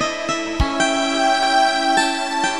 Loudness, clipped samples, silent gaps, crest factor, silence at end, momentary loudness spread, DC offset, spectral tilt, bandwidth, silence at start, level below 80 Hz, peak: -18 LUFS; under 0.1%; none; 14 dB; 0 s; 6 LU; 0.7%; -3 dB/octave; 12 kHz; 0 s; -34 dBFS; -4 dBFS